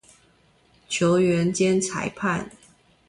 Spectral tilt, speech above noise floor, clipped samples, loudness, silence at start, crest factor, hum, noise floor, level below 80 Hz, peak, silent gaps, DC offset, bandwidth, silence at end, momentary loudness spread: -5 dB/octave; 38 dB; under 0.1%; -23 LUFS; 0.9 s; 16 dB; none; -60 dBFS; -58 dBFS; -10 dBFS; none; under 0.1%; 11.5 kHz; 0.6 s; 10 LU